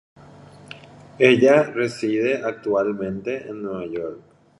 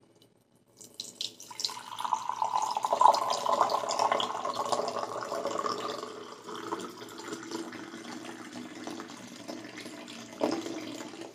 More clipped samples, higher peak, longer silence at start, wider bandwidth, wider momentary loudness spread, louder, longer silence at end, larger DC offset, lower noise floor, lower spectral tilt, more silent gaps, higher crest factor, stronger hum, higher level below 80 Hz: neither; first, -2 dBFS vs -6 dBFS; about the same, 0.7 s vs 0.75 s; second, 11.5 kHz vs 15.5 kHz; first, 22 LU vs 15 LU; first, -21 LUFS vs -33 LUFS; first, 0.4 s vs 0 s; neither; second, -45 dBFS vs -65 dBFS; first, -6 dB/octave vs -2.5 dB/octave; neither; second, 20 dB vs 28 dB; neither; first, -62 dBFS vs -82 dBFS